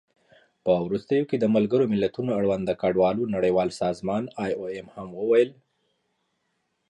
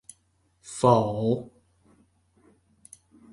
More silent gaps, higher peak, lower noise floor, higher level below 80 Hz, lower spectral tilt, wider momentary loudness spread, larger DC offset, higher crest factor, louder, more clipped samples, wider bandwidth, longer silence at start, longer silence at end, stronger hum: neither; second, -8 dBFS vs -4 dBFS; first, -75 dBFS vs -68 dBFS; about the same, -58 dBFS vs -60 dBFS; about the same, -7.5 dB/octave vs -7 dB/octave; second, 9 LU vs 20 LU; neither; second, 16 dB vs 24 dB; about the same, -25 LUFS vs -24 LUFS; neither; about the same, 11 kHz vs 11.5 kHz; about the same, 0.65 s vs 0.65 s; second, 1.35 s vs 1.85 s; neither